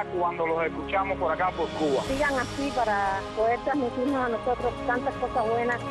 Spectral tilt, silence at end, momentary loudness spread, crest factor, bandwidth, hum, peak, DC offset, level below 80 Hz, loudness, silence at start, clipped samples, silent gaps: -5.5 dB/octave; 0 s; 3 LU; 12 dB; 12.5 kHz; none; -14 dBFS; under 0.1%; -46 dBFS; -27 LUFS; 0 s; under 0.1%; none